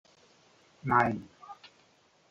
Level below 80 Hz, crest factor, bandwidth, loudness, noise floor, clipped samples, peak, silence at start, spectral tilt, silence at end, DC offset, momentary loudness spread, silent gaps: -66 dBFS; 24 dB; 7.8 kHz; -29 LUFS; -65 dBFS; under 0.1%; -10 dBFS; 0.85 s; -7.5 dB/octave; 0.75 s; under 0.1%; 23 LU; none